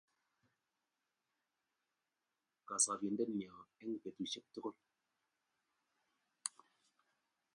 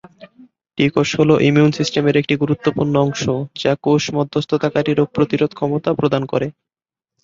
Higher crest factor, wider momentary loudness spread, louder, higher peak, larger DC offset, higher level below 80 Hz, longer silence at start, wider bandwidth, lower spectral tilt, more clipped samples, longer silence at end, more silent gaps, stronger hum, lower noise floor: first, 30 dB vs 16 dB; first, 14 LU vs 7 LU; second, -41 LUFS vs -17 LUFS; second, -18 dBFS vs 0 dBFS; neither; second, -90 dBFS vs -52 dBFS; first, 2.7 s vs 0.2 s; first, 11 kHz vs 7.6 kHz; second, -2.5 dB/octave vs -6 dB/octave; neither; first, 1.05 s vs 0.7 s; neither; neither; about the same, under -90 dBFS vs -88 dBFS